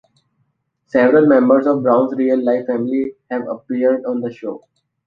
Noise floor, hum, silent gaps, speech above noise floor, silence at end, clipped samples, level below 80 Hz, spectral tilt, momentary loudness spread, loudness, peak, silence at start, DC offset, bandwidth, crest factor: -67 dBFS; none; none; 51 dB; 0.5 s; under 0.1%; -62 dBFS; -9 dB/octave; 14 LU; -16 LUFS; -2 dBFS; 0.95 s; under 0.1%; 5 kHz; 16 dB